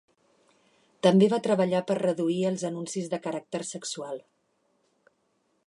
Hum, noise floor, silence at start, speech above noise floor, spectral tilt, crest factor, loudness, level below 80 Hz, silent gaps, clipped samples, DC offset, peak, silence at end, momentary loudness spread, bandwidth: none; -72 dBFS; 1.05 s; 46 dB; -5.5 dB/octave; 20 dB; -27 LUFS; -78 dBFS; none; under 0.1%; under 0.1%; -8 dBFS; 1.45 s; 13 LU; 11 kHz